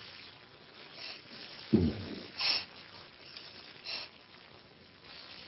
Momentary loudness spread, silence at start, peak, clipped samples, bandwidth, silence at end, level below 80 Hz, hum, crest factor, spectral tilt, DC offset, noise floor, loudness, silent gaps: 23 LU; 0 s; -12 dBFS; under 0.1%; 6 kHz; 0 s; -54 dBFS; none; 26 dB; -7.5 dB/octave; under 0.1%; -57 dBFS; -36 LUFS; none